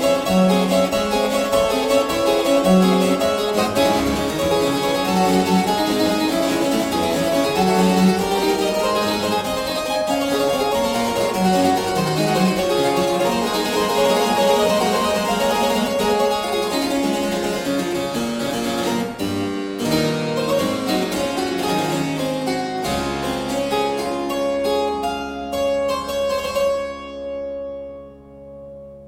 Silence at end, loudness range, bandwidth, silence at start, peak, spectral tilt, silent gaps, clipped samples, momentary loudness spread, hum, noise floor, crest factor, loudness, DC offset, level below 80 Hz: 0 s; 4 LU; 16.5 kHz; 0 s; -4 dBFS; -4.5 dB/octave; none; under 0.1%; 7 LU; none; -40 dBFS; 16 dB; -19 LUFS; under 0.1%; -44 dBFS